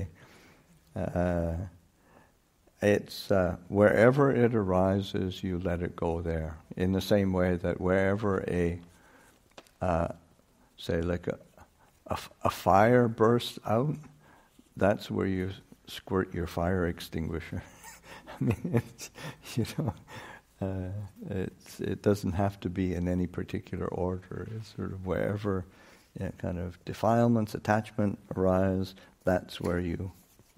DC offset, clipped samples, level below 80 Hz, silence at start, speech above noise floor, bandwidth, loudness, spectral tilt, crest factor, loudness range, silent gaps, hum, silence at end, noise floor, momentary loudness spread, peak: under 0.1%; under 0.1%; -52 dBFS; 0 s; 36 dB; 16 kHz; -30 LUFS; -7 dB/octave; 22 dB; 8 LU; none; none; 0.45 s; -65 dBFS; 17 LU; -8 dBFS